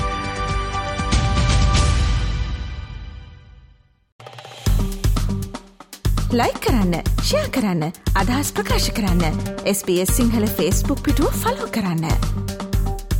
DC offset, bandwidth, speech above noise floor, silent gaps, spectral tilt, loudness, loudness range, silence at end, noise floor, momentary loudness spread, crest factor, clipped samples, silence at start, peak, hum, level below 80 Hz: under 0.1%; 17.5 kHz; 32 dB; 4.12-4.19 s; -5 dB/octave; -21 LUFS; 7 LU; 0 s; -51 dBFS; 12 LU; 16 dB; under 0.1%; 0 s; -4 dBFS; none; -24 dBFS